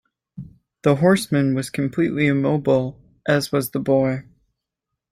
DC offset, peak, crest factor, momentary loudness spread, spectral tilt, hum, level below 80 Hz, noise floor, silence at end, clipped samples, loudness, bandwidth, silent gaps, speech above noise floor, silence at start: under 0.1%; -4 dBFS; 18 dB; 14 LU; -6.5 dB/octave; none; -56 dBFS; -82 dBFS; 0.9 s; under 0.1%; -20 LUFS; 16 kHz; none; 63 dB; 0.35 s